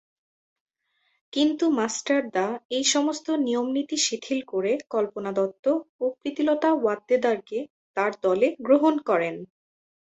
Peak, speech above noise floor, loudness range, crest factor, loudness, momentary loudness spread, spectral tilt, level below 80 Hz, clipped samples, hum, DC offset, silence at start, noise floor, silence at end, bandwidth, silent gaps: -8 dBFS; 48 dB; 2 LU; 18 dB; -25 LUFS; 7 LU; -3 dB/octave; -72 dBFS; under 0.1%; none; under 0.1%; 1.35 s; -72 dBFS; 0.75 s; 8.4 kHz; 2.65-2.69 s, 5.59-5.63 s, 5.89-5.99 s, 7.70-7.94 s